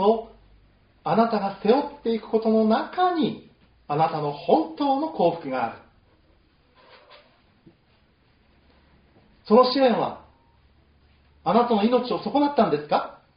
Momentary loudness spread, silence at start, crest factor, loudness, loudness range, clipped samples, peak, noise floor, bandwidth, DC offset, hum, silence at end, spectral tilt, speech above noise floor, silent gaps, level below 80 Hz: 9 LU; 0 s; 22 dB; -23 LUFS; 6 LU; under 0.1%; -4 dBFS; -61 dBFS; 5.2 kHz; under 0.1%; none; 0.25 s; -4.5 dB/octave; 40 dB; none; -62 dBFS